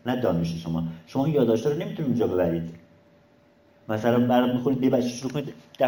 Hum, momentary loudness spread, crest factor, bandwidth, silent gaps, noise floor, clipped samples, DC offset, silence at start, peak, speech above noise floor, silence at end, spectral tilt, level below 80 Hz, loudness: none; 10 LU; 16 dB; 17 kHz; none; -58 dBFS; under 0.1%; under 0.1%; 0.05 s; -8 dBFS; 34 dB; 0 s; -7 dB/octave; -58 dBFS; -25 LUFS